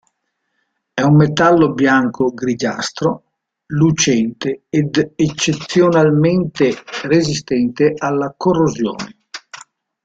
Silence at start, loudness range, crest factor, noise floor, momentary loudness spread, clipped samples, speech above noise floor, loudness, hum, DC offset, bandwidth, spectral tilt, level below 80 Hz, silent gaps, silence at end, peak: 0.95 s; 3 LU; 14 dB; -71 dBFS; 12 LU; under 0.1%; 56 dB; -15 LUFS; none; under 0.1%; 8 kHz; -5.5 dB/octave; -50 dBFS; none; 0.5 s; -2 dBFS